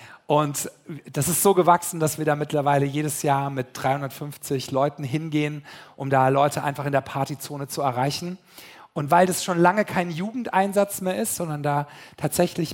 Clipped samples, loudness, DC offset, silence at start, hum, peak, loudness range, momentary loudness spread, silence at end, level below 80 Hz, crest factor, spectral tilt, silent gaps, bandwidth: under 0.1%; -23 LUFS; under 0.1%; 0 s; none; -4 dBFS; 3 LU; 13 LU; 0 s; -62 dBFS; 20 dB; -5 dB/octave; none; 17 kHz